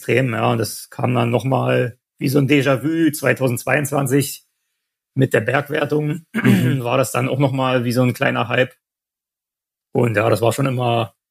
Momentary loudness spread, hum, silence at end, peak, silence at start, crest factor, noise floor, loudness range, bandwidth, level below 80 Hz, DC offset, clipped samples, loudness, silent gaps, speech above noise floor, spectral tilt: 7 LU; none; 0.2 s; 0 dBFS; 0 s; 18 dB; -87 dBFS; 2 LU; 15.5 kHz; -62 dBFS; under 0.1%; under 0.1%; -18 LUFS; none; 70 dB; -6 dB/octave